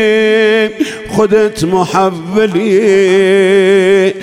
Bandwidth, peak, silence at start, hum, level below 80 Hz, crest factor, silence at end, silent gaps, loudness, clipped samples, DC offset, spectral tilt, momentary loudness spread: 12.5 kHz; 0 dBFS; 0 s; none; -46 dBFS; 10 dB; 0 s; none; -10 LUFS; under 0.1%; under 0.1%; -5.5 dB/octave; 5 LU